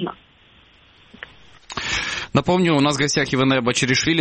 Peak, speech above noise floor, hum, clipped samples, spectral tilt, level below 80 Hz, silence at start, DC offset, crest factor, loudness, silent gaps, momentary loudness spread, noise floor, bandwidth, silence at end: -2 dBFS; 34 dB; none; under 0.1%; -4 dB/octave; -48 dBFS; 0 s; under 0.1%; 18 dB; -19 LUFS; none; 23 LU; -52 dBFS; 8.8 kHz; 0 s